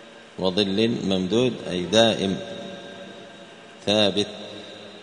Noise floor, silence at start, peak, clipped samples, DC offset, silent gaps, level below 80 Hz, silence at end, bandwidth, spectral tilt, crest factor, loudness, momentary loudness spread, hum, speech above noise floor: -44 dBFS; 0 s; -4 dBFS; under 0.1%; under 0.1%; none; -60 dBFS; 0 s; 10.5 kHz; -4.5 dB/octave; 22 dB; -22 LUFS; 22 LU; none; 22 dB